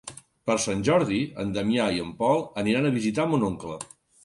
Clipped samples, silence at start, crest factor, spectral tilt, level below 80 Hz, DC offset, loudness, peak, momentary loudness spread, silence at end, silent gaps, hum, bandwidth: under 0.1%; 0.05 s; 16 dB; -5 dB/octave; -54 dBFS; under 0.1%; -25 LUFS; -8 dBFS; 12 LU; 0.4 s; none; none; 11.5 kHz